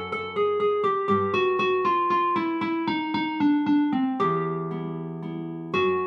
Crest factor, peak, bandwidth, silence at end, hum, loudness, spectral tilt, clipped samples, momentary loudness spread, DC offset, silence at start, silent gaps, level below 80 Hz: 14 dB; -10 dBFS; 6.6 kHz; 0 s; none; -25 LUFS; -7.5 dB/octave; under 0.1%; 10 LU; under 0.1%; 0 s; none; -68 dBFS